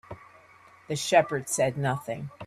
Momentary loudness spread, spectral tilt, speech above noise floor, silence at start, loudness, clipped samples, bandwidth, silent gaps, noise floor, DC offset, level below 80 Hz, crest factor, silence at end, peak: 17 LU; -4 dB/octave; 28 dB; 0.1 s; -27 LUFS; under 0.1%; 14.5 kHz; none; -55 dBFS; under 0.1%; -64 dBFS; 20 dB; 0 s; -8 dBFS